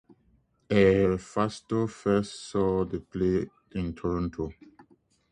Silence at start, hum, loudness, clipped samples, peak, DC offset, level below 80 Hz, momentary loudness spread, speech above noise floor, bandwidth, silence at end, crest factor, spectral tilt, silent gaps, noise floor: 0.7 s; none; -28 LUFS; under 0.1%; -8 dBFS; under 0.1%; -48 dBFS; 13 LU; 40 dB; 10 kHz; 0.8 s; 20 dB; -7 dB/octave; none; -67 dBFS